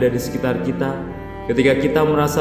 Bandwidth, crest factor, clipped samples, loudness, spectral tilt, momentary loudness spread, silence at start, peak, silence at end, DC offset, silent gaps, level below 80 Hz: 16 kHz; 16 dB; under 0.1%; -19 LUFS; -6 dB/octave; 12 LU; 0 s; -2 dBFS; 0 s; 0.1%; none; -38 dBFS